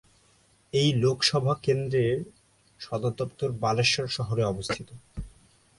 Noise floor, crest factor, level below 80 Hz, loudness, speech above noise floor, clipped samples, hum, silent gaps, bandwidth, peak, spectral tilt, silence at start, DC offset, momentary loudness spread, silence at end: -63 dBFS; 20 dB; -52 dBFS; -26 LUFS; 36 dB; under 0.1%; none; none; 11.5 kHz; -8 dBFS; -5 dB/octave; 0.75 s; under 0.1%; 19 LU; 0.5 s